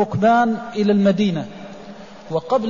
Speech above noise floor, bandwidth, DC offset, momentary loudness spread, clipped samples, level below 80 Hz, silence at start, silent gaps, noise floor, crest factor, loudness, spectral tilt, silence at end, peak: 21 dB; 7.4 kHz; 0.4%; 22 LU; under 0.1%; -56 dBFS; 0 s; none; -38 dBFS; 14 dB; -18 LUFS; -7.5 dB/octave; 0 s; -6 dBFS